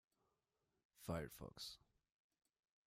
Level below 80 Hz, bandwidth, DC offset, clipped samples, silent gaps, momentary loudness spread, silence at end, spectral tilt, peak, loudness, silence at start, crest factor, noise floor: -72 dBFS; 15.5 kHz; under 0.1%; under 0.1%; none; 8 LU; 1.1 s; -5 dB/octave; -34 dBFS; -52 LUFS; 0.95 s; 22 dB; -90 dBFS